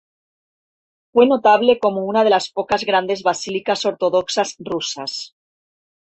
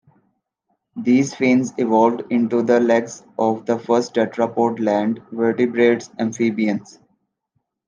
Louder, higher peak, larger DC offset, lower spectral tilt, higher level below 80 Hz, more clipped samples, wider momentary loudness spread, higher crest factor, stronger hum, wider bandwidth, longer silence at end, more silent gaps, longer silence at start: about the same, -18 LUFS vs -19 LUFS; about the same, -2 dBFS vs -2 dBFS; neither; second, -3.5 dB/octave vs -6 dB/octave; first, -60 dBFS vs -70 dBFS; neither; first, 11 LU vs 7 LU; about the same, 18 dB vs 16 dB; neither; second, 8.4 kHz vs 9.4 kHz; second, 0.85 s vs 1.05 s; neither; first, 1.15 s vs 0.95 s